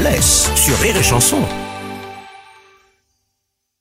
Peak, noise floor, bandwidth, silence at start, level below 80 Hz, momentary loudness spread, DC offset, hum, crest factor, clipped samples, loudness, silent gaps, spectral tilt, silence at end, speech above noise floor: 0 dBFS; -73 dBFS; 16.5 kHz; 0 s; -28 dBFS; 20 LU; under 0.1%; none; 18 dB; under 0.1%; -12 LUFS; none; -3 dB/octave; 1.45 s; 59 dB